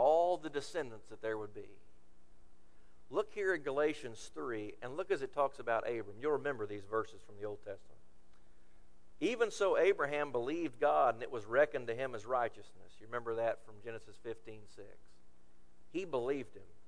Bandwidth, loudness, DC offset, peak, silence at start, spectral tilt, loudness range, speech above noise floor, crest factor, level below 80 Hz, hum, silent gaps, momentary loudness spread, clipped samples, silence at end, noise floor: 11 kHz; -37 LUFS; 0.4%; -18 dBFS; 0 s; -5 dB/octave; 9 LU; 28 dB; 20 dB; -68 dBFS; none; none; 16 LU; under 0.1%; 0.25 s; -66 dBFS